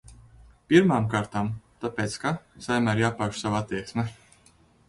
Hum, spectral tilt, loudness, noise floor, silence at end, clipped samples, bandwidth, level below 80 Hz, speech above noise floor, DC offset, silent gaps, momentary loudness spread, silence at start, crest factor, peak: none; -6 dB/octave; -26 LUFS; -59 dBFS; 0.75 s; under 0.1%; 11.5 kHz; -54 dBFS; 34 dB; under 0.1%; none; 13 LU; 0.1 s; 22 dB; -4 dBFS